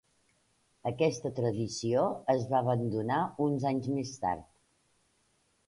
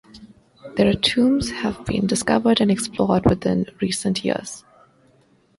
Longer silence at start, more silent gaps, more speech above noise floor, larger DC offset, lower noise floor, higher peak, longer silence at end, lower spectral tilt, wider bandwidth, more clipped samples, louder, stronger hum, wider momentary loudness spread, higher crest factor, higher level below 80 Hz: first, 0.85 s vs 0.15 s; neither; first, 42 dB vs 38 dB; neither; first, -72 dBFS vs -58 dBFS; second, -14 dBFS vs -2 dBFS; first, 1.25 s vs 1 s; first, -6.5 dB/octave vs -5 dB/octave; about the same, 11.5 kHz vs 11.5 kHz; neither; second, -32 LUFS vs -20 LUFS; neither; second, 6 LU vs 9 LU; about the same, 18 dB vs 20 dB; second, -64 dBFS vs -44 dBFS